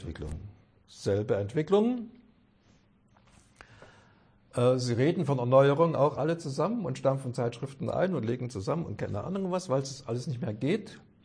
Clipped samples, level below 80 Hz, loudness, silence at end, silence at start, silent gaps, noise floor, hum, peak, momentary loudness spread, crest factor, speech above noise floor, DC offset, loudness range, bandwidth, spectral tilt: under 0.1%; -56 dBFS; -29 LUFS; 0.25 s; 0 s; none; -63 dBFS; none; -10 dBFS; 13 LU; 20 dB; 35 dB; under 0.1%; 6 LU; 10.5 kHz; -7 dB/octave